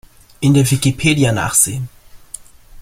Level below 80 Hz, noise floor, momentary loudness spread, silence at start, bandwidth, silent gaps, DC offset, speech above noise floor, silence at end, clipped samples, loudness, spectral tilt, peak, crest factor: -42 dBFS; -37 dBFS; 21 LU; 0.4 s; 16.5 kHz; none; under 0.1%; 23 dB; 0 s; under 0.1%; -14 LUFS; -4.5 dB/octave; 0 dBFS; 16 dB